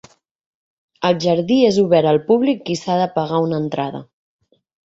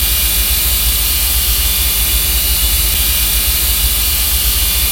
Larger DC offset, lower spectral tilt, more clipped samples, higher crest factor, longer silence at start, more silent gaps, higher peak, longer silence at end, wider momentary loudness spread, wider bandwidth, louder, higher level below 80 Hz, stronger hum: neither; first, -6.5 dB/octave vs -1 dB/octave; neither; about the same, 16 dB vs 14 dB; first, 1 s vs 0 s; neither; about the same, -2 dBFS vs 0 dBFS; first, 0.8 s vs 0 s; first, 9 LU vs 0 LU; second, 7.8 kHz vs 17 kHz; second, -17 LUFS vs -11 LUFS; second, -58 dBFS vs -18 dBFS; neither